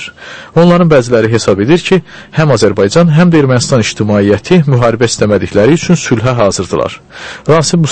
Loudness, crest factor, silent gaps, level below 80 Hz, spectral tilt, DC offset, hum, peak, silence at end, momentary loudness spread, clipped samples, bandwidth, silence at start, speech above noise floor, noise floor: -9 LUFS; 8 dB; none; -38 dBFS; -6 dB/octave; under 0.1%; none; 0 dBFS; 0 s; 8 LU; 0.6%; 8.8 kHz; 0 s; 20 dB; -28 dBFS